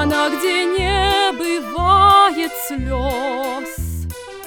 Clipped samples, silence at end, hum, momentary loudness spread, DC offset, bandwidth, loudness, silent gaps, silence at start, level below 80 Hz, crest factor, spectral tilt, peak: under 0.1%; 0 s; none; 15 LU; under 0.1%; over 20 kHz; -17 LUFS; none; 0 s; -32 dBFS; 16 dB; -4 dB/octave; -2 dBFS